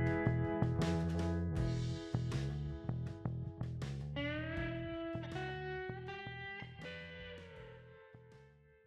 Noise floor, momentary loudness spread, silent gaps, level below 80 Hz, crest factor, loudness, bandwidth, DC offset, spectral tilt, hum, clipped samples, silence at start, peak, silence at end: -63 dBFS; 16 LU; none; -52 dBFS; 22 dB; -40 LUFS; 10.5 kHz; under 0.1%; -7 dB/octave; none; under 0.1%; 0 s; -18 dBFS; 0.35 s